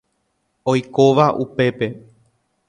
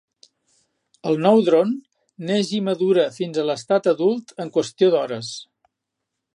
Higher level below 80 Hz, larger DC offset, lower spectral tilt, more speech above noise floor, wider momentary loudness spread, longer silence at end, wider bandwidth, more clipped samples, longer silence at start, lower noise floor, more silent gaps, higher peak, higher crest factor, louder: first, -58 dBFS vs -74 dBFS; neither; about the same, -6.5 dB/octave vs -6 dB/octave; second, 53 dB vs 61 dB; about the same, 12 LU vs 14 LU; second, 0.7 s vs 0.95 s; second, 9.8 kHz vs 11 kHz; neither; second, 0.65 s vs 1.05 s; second, -69 dBFS vs -81 dBFS; neither; first, 0 dBFS vs -4 dBFS; about the same, 18 dB vs 18 dB; about the same, -18 LUFS vs -20 LUFS